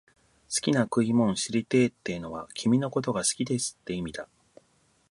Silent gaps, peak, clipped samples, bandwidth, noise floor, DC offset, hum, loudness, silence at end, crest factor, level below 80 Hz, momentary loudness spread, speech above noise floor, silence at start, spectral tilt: none; -10 dBFS; under 0.1%; 11.5 kHz; -67 dBFS; under 0.1%; none; -27 LUFS; 0.85 s; 20 dB; -60 dBFS; 11 LU; 40 dB; 0.5 s; -4.5 dB/octave